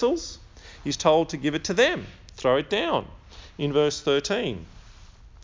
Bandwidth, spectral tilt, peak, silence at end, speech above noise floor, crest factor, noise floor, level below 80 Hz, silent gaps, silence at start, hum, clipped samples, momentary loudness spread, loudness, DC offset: 7.6 kHz; -4 dB/octave; -4 dBFS; 0 s; 24 dB; 22 dB; -48 dBFS; -48 dBFS; none; 0 s; none; under 0.1%; 17 LU; -24 LUFS; under 0.1%